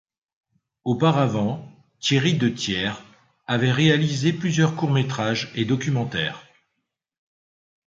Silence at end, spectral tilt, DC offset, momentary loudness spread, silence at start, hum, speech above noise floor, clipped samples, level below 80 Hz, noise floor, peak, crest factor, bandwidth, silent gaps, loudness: 1.45 s; -5.5 dB/octave; under 0.1%; 10 LU; 0.85 s; none; 58 dB; under 0.1%; -58 dBFS; -79 dBFS; -4 dBFS; 18 dB; 7.8 kHz; none; -22 LUFS